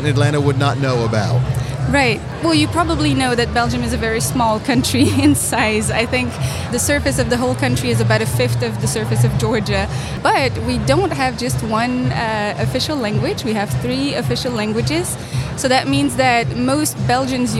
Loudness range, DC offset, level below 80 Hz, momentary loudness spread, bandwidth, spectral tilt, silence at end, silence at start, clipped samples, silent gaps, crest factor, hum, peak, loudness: 3 LU; under 0.1%; -36 dBFS; 5 LU; 15.5 kHz; -5 dB/octave; 0 s; 0 s; under 0.1%; none; 16 dB; none; -2 dBFS; -17 LUFS